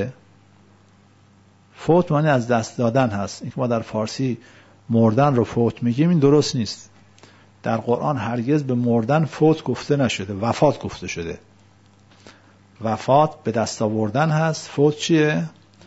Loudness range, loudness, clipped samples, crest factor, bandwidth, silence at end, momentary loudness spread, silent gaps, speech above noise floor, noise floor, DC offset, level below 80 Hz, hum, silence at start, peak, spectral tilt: 4 LU; -20 LUFS; under 0.1%; 18 dB; 8 kHz; 0.35 s; 12 LU; none; 34 dB; -53 dBFS; under 0.1%; -56 dBFS; none; 0 s; -2 dBFS; -6.5 dB/octave